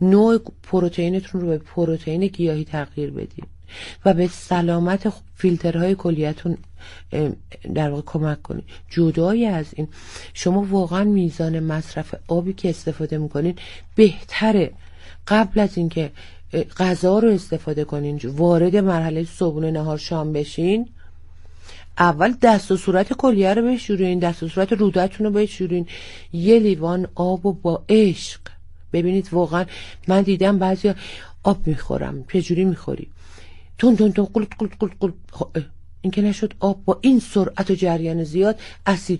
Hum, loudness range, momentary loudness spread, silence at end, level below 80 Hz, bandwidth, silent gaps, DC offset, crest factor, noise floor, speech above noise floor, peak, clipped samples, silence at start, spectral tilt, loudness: none; 4 LU; 13 LU; 0 s; -42 dBFS; 11.5 kHz; none; under 0.1%; 18 dB; -39 dBFS; 19 dB; -2 dBFS; under 0.1%; 0 s; -7 dB/octave; -20 LUFS